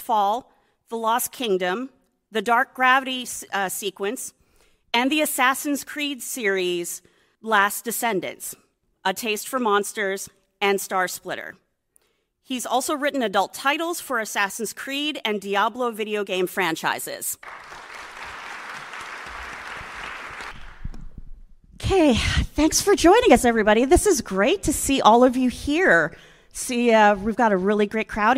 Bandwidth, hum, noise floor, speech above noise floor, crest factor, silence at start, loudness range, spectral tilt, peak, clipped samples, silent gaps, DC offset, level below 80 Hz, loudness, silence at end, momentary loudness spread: 16 kHz; none; -68 dBFS; 46 dB; 22 dB; 0 s; 11 LU; -3.5 dB/octave; 0 dBFS; under 0.1%; none; under 0.1%; -42 dBFS; -21 LUFS; 0 s; 18 LU